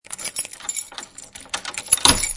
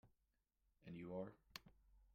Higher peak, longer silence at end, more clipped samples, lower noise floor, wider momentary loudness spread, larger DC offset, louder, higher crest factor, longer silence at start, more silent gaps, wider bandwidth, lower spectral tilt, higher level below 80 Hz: first, 0 dBFS vs -34 dBFS; about the same, 0 s vs 0 s; neither; second, -41 dBFS vs -87 dBFS; first, 22 LU vs 8 LU; neither; first, -20 LUFS vs -55 LUFS; about the same, 24 dB vs 24 dB; about the same, 0.1 s vs 0.05 s; neither; first, 12 kHz vs 6 kHz; second, -0.5 dB/octave vs -5 dB/octave; first, -40 dBFS vs -76 dBFS